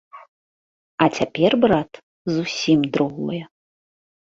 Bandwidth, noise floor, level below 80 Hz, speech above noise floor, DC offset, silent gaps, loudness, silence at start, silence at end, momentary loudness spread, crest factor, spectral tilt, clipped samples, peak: 7.8 kHz; under -90 dBFS; -56 dBFS; over 71 dB; under 0.1%; 0.28-0.98 s, 2.03-2.25 s; -20 LUFS; 0.15 s; 0.8 s; 15 LU; 22 dB; -5.5 dB/octave; under 0.1%; 0 dBFS